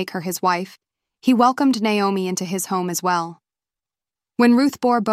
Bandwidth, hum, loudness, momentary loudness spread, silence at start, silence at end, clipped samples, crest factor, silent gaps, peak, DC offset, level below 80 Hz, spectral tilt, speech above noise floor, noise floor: 16 kHz; none; -19 LUFS; 9 LU; 0 s; 0 s; under 0.1%; 18 dB; none; -4 dBFS; under 0.1%; -68 dBFS; -4.5 dB/octave; over 71 dB; under -90 dBFS